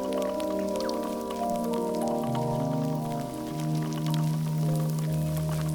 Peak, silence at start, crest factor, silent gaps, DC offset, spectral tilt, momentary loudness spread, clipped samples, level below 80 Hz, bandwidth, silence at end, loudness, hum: -14 dBFS; 0 s; 14 dB; none; under 0.1%; -7 dB/octave; 4 LU; under 0.1%; -52 dBFS; over 20 kHz; 0 s; -29 LUFS; none